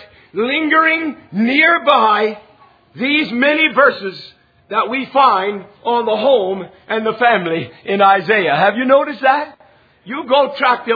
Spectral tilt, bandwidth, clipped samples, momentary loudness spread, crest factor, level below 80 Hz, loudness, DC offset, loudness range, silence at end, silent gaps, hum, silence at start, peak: -7 dB/octave; 5 kHz; under 0.1%; 12 LU; 16 dB; -62 dBFS; -14 LUFS; under 0.1%; 2 LU; 0 s; none; none; 0 s; 0 dBFS